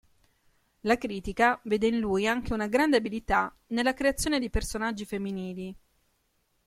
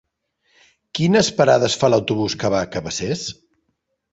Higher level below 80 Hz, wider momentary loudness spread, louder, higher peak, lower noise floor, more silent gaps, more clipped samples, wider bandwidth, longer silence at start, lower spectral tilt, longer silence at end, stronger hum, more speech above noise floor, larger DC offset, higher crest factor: first, -44 dBFS vs -52 dBFS; about the same, 10 LU vs 10 LU; second, -28 LUFS vs -19 LUFS; second, -10 dBFS vs -2 dBFS; about the same, -73 dBFS vs -72 dBFS; neither; neither; first, 16 kHz vs 8.2 kHz; about the same, 0.85 s vs 0.95 s; about the same, -4.5 dB/octave vs -4.5 dB/octave; about the same, 0.9 s vs 0.8 s; neither; second, 45 dB vs 54 dB; neither; about the same, 20 dB vs 18 dB